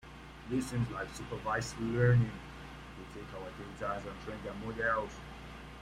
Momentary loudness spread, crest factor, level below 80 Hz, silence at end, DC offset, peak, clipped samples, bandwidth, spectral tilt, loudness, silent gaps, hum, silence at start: 18 LU; 22 dB; -52 dBFS; 0 s; under 0.1%; -14 dBFS; under 0.1%; 12.5 kHz; -6.5 dB/octave; -35 LUFS; none; none; 0.05 s